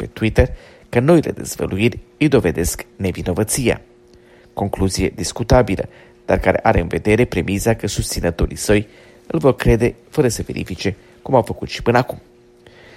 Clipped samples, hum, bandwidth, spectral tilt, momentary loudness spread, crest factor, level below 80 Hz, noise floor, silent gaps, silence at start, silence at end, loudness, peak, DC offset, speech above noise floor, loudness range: under 0.1%; none; 16 kHz; -5.5 dB/octave; 10 LU; 18 dB; -30 dBFS; -47 dBFS; none; 0 s; 0.75 s; -18 LUFS; 0 dBFS; under 0.1%; 30 dB; 2 LU